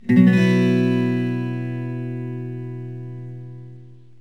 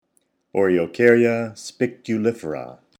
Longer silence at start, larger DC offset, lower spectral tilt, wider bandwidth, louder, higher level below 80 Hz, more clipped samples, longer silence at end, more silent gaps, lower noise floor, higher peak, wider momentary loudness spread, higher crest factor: second, 0.05 s vs 0.55 s; first, 0.5% vs under 0.1%; first, -8.5 dB/octave vs -6.5 dB/octave; second, 8 kHz vs 11.5 kHz; about the same, -20 LUFS vs -21 LUFS; about the same, -68 dBFS vs -64 dBFS; neither; about the same, 0.25 s vs 0.3 s; neither; second, -44 dBFS vs -68 dBFS; about the same, -2 dBFS vs -2 dBFS; first, 21 LU vs 15 LU; about the same, 18 dB vs 20 dB